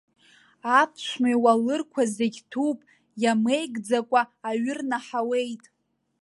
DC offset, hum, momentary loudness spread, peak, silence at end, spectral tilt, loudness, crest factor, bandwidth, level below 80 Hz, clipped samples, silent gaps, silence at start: under 0.1%; none; 8 LU; -6 dBFS; 0.65 s; -4 dB/octave; -25 LUFS; 20 dB; 11.5 kHz; -78 dBFS; under 0.1%; none; 0.65 s